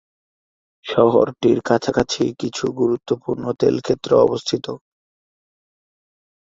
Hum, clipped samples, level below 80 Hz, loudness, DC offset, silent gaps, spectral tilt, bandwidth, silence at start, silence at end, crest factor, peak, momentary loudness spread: none; under 0.1%; -54 dBFS; -19 LUFS; under 0.1%; none; -5.5 dB/octave; 7.8 kHz; 0.85 s; 1.8 s; 18 dB; -2 dBFS; 9 LU